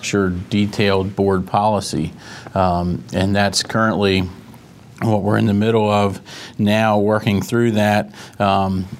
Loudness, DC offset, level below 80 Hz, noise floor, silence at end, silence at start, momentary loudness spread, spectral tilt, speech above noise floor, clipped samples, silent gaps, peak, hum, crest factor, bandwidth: -18 LUFS; under 0.1%; -52 dBFS; -41 dBFS; 0 s; 0 s; 8 LU; -5.5 dB/octave; 24 dB; under 0.1%; none; -2 dBFS; none; 16 dB; 15 kHz